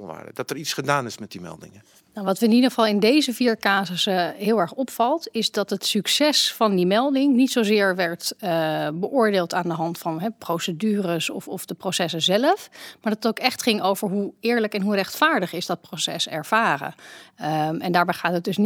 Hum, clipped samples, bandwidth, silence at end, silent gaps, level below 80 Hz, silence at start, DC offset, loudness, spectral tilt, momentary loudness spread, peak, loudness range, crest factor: none; under 0.1%; 18.5 kHz; 0 s; none; -74 dBFS; 0 s; under 0.1%; -22 LUFS; -4 dB/octave; 10 LU; -2 dBFS; 4 LU; 20 dB